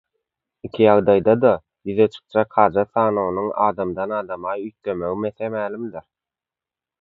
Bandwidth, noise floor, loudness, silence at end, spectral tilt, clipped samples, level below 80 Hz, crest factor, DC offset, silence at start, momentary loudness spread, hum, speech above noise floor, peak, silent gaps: 4.7 kHz; -89 dBFS; -20 LUFS; 1 s; -9 dB/octave; under 0.1%; -54 dBFS; 20 dB; under 0.1%; 0.65 s; 12 LU; none; 70 dB; 0 dBFS; none